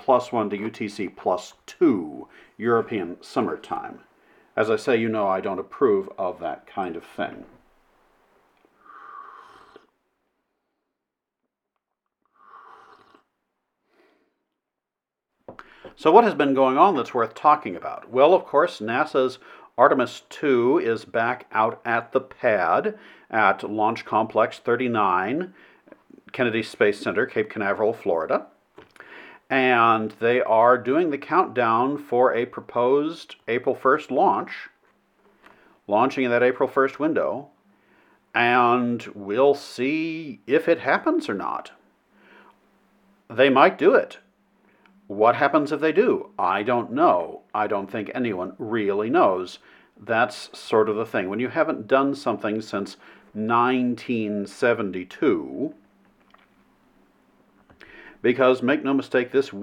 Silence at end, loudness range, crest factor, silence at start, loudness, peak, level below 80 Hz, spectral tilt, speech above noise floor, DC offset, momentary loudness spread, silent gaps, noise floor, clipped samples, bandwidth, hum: 0 s; 6 LU; 24 dB; 0.1 s; -22 LUFS; 0 dBFS; -72 dBFS; -6 dB/octave; 65 dB; under 0.1%; 13 LU; none; -87 dBFS; under 0.1%; 12 kHz; none